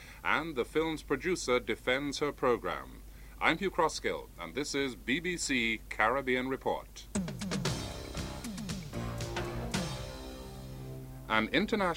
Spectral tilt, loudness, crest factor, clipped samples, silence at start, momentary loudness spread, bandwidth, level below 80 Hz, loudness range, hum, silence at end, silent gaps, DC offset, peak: -4 dB/octave; -33 LUFS; 24 dB; under 0.1%; 0 s; 14 LU; 16 kHz; -50 dBFS; 6 LU; none; 0 s; none; under 0.1%; -10 dBFS